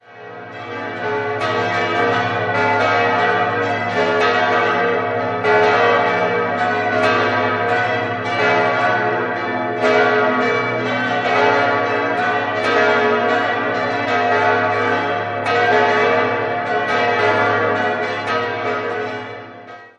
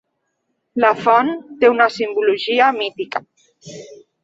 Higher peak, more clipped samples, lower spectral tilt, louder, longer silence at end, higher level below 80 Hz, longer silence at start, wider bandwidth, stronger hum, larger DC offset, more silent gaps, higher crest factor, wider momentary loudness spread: about the same, -2 dBFS vs -2 dBFS; neither; about the same, -5 dB/octave vs -4.5 dB/octave; about the same, -17 LUFS vs -16 LUFS; second, 0.1 s vs 0.3 s; first, -58 dBFS vs -66 dBFS; second, 0.1 s vs 0.75 s; first, 9.6 kHz vs 7.8 kHz; first, 60 Hz at -45 dBFS vs none; neither; neither; about the same, 16 dB vs 16 dB; second, 7 LU vs 22 LU